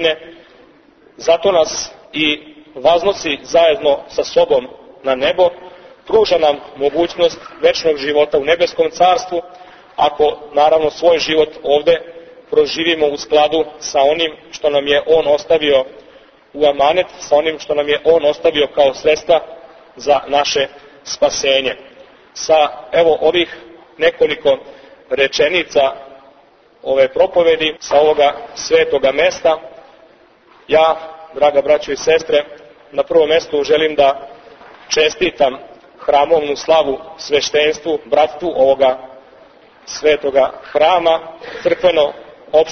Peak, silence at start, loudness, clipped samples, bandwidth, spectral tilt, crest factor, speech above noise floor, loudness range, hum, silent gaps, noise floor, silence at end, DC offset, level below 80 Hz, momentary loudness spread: 0 dBFS; 0 s; -15 LUFS; under 0.1%; 6.6 kHz; -3 dB/octave; 14 dB; 35 dB; 2 LU; none; none; -49 dBFS; 0 s; under 0.1%; -50 dBFS; 10 LU